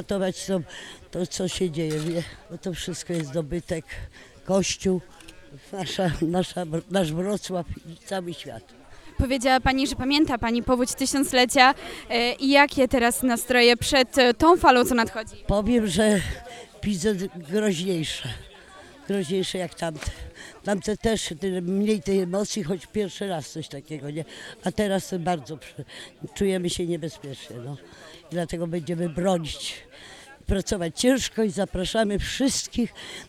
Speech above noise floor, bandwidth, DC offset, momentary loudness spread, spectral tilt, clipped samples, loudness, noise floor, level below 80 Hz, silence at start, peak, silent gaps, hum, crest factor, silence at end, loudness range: 22 dB; 16.5 kHz; under 0.1%; 20 LU; -4 dB/octave; under 0.1%; -24 LUFS; -47 dBFS; -42 dBFS; 0 s; -2 dBFS; none; none; 22 dB; 0 s; 10 LU